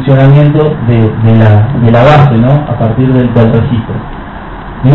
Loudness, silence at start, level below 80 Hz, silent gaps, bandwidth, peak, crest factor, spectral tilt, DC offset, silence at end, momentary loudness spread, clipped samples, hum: -7 LUFS; 0 s; -26 dBFS; none; 5 kHz; 0 dBFS; 6 dB; -10 dB/octave; under 0.1%; 0 s; 17 LU; 4%; none